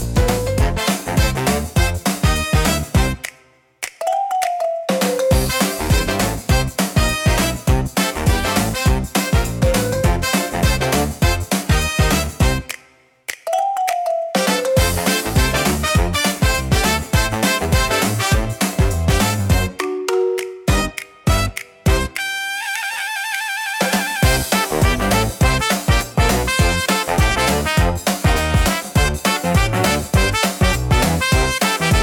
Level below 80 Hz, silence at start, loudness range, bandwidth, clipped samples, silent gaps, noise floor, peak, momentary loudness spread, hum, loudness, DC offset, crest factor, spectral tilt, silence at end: -24 dBFS; 0 s; 3 LU; 18 kHz; under 0.1%; none; -52 dBFS; -2 dBFS; 5 LU; none; -18 LUFS; under 0.1%; 16 dB; -4.5 dB/octave; 0 s